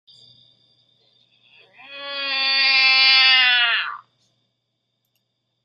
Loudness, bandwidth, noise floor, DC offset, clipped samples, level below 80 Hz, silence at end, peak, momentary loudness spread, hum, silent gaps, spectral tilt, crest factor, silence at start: -14 LUFS; 13.5 kHz; -75 dBFS; under 0.1%; under 0.1%; -88 dBFS; 1.65 s; -2 dBFS; 18 LU; none; none; 0.5 dB/octave; 20 dB; 1.9 s